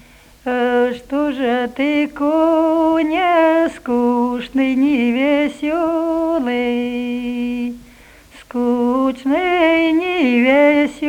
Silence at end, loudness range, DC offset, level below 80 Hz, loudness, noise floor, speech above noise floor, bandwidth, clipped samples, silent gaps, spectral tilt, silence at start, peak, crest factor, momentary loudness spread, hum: 0 s; 5 LU; under 0.1%; -50 dBFS; -16 LUFS; -44 dBFS; 28 dB; 14 kHz; under 0.1%; none; -5 dB/octave; 0.45 s; -2 dBFS; 14 dB; 8 LU; 50 Hz at -55 dBFS